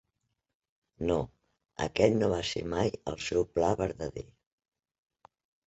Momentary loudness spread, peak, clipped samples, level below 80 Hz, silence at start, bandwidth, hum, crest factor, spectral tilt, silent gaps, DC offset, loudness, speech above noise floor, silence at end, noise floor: 15 LU; -8 dBFS; under 0.1%; -52 dBFS; 1 s; 8.2 kHz; none; 24 dB; -5.5 dB/octave; none; under 0.1%; -31 LUFS; 52 dB; 1.4 s; -82 dBFS